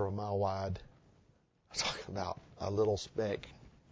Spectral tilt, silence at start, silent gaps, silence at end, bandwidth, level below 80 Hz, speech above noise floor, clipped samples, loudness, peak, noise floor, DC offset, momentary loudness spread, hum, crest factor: -4.5 dB/octave; 0 s; none; 0.25 s; 8 kHz; -56 dBFS; 33 dB; under 0.1%; -37 LUFS; -20 dBFS; -69 dBFS; under 0.1%; 9 LU; none; 18 dB